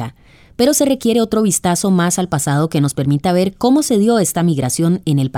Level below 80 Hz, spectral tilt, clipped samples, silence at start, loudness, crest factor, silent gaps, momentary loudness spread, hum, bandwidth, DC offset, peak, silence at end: -48 dBFS; -5.5 dB/octave; under 0.1%; 0 s; -15 LUFS; 14 dB; none; 3 LU; none; 18.5 kHz; under 0.1%; -2 dBFS; 0 s